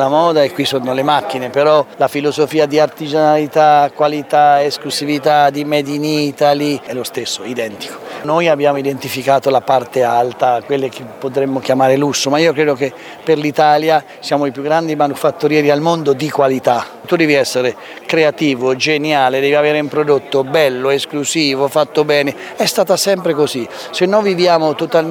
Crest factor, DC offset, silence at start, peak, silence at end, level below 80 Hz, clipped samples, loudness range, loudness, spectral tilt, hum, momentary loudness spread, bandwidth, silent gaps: 14 dB; under 0.1%; 0 s; 0 dBFS; 0 s; -64 dBFS; under 0.1%; 3 LU; -14 LUFS; -4.5 dB/octave; none; 7 LU; 19.5 kHz; none